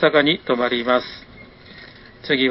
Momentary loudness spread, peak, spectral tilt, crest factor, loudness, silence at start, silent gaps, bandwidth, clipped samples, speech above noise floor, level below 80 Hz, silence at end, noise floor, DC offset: 23 LU; -2 dBFS; -9 dB/octave; 20 dB; -19 LUFS; 0 s; none; 5.8 kHz; under 0.1%; 24 dB; -54 dBFS; 0 s; -43 dBFS; under 0.1%